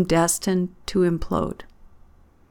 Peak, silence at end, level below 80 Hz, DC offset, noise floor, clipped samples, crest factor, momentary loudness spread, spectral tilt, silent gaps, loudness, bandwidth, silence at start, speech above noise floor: -8 dBFS; 0.9 s; -42 dBFS; under 0.1%; -52 dBFS; under 0.1%; 16 dB; 9 LU; -5 dB/octave; none; -23 LUFS; 19 kHz; 0 s; 30 dB